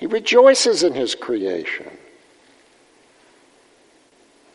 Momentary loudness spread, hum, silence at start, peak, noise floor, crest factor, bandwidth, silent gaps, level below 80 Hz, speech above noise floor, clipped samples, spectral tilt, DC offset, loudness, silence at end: 16 LU; none; 0 s; 0 dBFS; -55 dBFS; 20 dB; 11.5 kHz; none; -70 dBFS; 38 dB; under 0.1%; -2 dB/octave; under 0.1%; -17 LUFS; 2.6 s